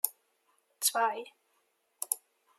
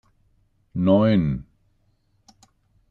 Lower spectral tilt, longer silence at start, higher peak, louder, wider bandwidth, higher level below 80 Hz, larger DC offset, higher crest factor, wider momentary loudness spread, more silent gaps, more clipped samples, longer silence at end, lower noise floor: second, 2 dB/octave vs -9.5 dB/octave; second, 0.05 s vs 0.75 s; about the same, -8 dBFS vs -6 dBFS; second, -32 LUFS vs -21 LUFS; first, 16 kHz vs 7 kHz; second, under -90 dBFS vs -48 dBFS; neither; first, 28 dB vs 18 dB; about the same, 14 LU vs 15 LU; neither; neither; second, 0.4 s vs 1.5 s; first, -75 dBFS vs -65 dBFS